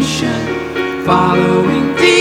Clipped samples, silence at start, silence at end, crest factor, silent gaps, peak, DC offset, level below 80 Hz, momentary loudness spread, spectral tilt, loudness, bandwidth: under 0.1%; 0 s; 0 s; 12 dB; none; 0 dBFS; under 0.1%; -40 dBFS; 8 LU; -5 dB/octave; -13 LUFS; 16.5 kHz